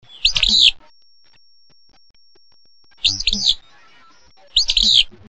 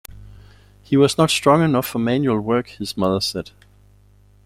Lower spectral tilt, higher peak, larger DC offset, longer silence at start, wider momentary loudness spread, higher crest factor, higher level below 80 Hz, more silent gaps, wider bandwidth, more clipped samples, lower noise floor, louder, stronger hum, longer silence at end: second, 0.5 dB/octave vs -5.5 dB/octave; about the same, -2 dBFS vs -2 dBFS; first, 0.4% vs under 0.1%; about the same, 0.15 s vs 0.1 s; about the same, 8 LU vs 10 LU; about the same, 18 dB vs 18 dB; first, -36 dBFS vs -50 dBFS; first, 2.10-2.14 s vs none; second, 8.8 kHz vs 16 kHz; neither; first, -56 dBFS vs -52 dBFS; first, -14 LUFS vs -19 LUFS; second, none vs 50 Hz at -45 dBFS; second, 0.2 s vs 1.05 s